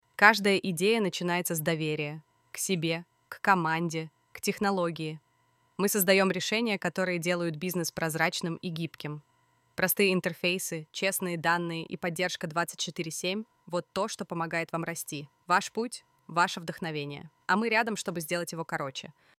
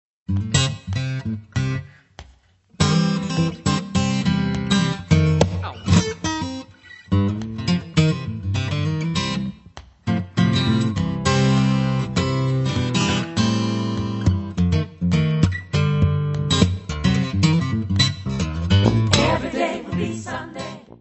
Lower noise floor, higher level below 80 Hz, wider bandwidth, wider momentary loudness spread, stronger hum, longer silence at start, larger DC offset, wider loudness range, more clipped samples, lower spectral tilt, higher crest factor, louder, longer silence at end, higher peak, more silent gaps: first, -69 dBFS vs -54 dBFS; second, -72 dBFS vs -40 dBFS; first, 16.5 kHz vs 8.4 kHz; first, 12 LU vs 9 LU; neither; about the same, 0.2 s vs 0.3 s; neither; about the same, 4 LU vs 3 LU; neither; second, -4 dB/octave vs -5.5 dB/octave; first, 26 dB vs 20 dB; second, -29 LUFS vs -21 LUFS; first, 0.3 s vs 0.05 s; second, -4 dBFS vs 0 dBFS; neither